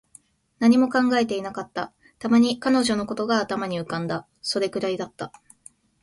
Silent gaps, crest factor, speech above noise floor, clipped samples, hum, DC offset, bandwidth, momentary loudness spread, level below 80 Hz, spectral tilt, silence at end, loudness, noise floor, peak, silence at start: none; 18 dB; 32 dB; under 0.1%; none; under 0.1%; 11.5 kHz; 14 LU; -62 dBFS; -5 dB/octave; 0.75 s; -23 LUFS; -55 dBFS; -6 dBFS; 0.6 s